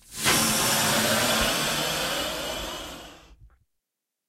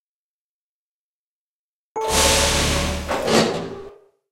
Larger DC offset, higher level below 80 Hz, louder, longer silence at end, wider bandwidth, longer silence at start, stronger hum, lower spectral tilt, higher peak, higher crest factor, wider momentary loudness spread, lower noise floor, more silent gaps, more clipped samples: neither; second, -48 dBFS vs -34 dBFS; second, -23 LUFS vs -19 LUFS; first, 0.8 s vs 0.4 s; about the same, 16 kHz vs 16 kHz; second, 0.1 s vs 1.95 s; neither; second, -1.5 dB/octave vs -3 dB/octave; second, -8 dBFS vs -2 dBFS; about the same, 18 dB vs 22 dB; second, 14 LU vs 18 LU; second, -84 dBFS vs under -90 dBFS; neither; neither